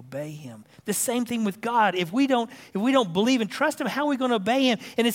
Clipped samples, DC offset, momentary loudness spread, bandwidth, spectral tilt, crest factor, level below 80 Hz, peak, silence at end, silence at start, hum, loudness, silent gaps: under 0.1%; under 0.1%; 13 LU; 16.5 kHz; -4 dB/octave; 16 dB; -72 dBFS; -8 dBFS; 0 s; 0 s; none; -24 LUFS; none